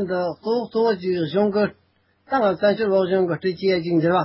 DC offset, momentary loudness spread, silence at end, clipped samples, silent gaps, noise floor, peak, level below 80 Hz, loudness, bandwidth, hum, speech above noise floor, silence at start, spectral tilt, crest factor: under 0.1%; 5 LU; 0 s; under 0.1%; none; -58 dBFS; -8 dBFS; -58 dBFS; -21 LUFS; 5.8 kHz; none; 38 dB; 0 s; -11 dB/octave; 14 dB